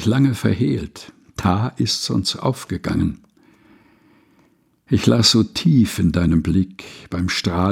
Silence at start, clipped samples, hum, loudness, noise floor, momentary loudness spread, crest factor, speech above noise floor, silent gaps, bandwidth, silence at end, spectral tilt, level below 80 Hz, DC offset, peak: 0 s; under 0.1%; none; -19 LUFS; -58 dBFS; 13 LU; 18 dB; 40 dB; none; 16.5 kHz; 0 s; -5.5 dB/octave; -40 dBFS; under 0.1%; -2 dBFS